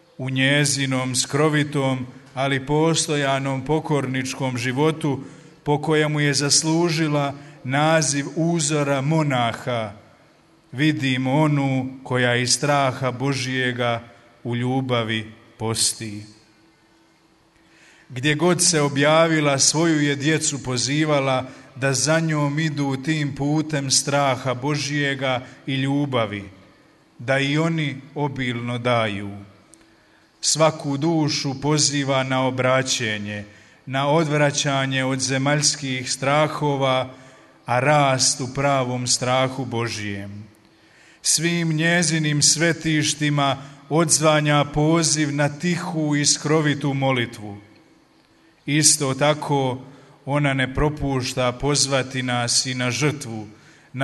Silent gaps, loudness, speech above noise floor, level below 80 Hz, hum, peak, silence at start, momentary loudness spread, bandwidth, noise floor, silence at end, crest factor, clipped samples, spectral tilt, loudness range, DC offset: none; -20 LUFS; 37 dB; -50 dBFS; none; -2 dBFS; 0.2 s; 11 LU; 12 kHz; -57 dBFS; 0 s; 20 dB; under 0.1%; -4 dB/octave; 5 LU; under 0.1%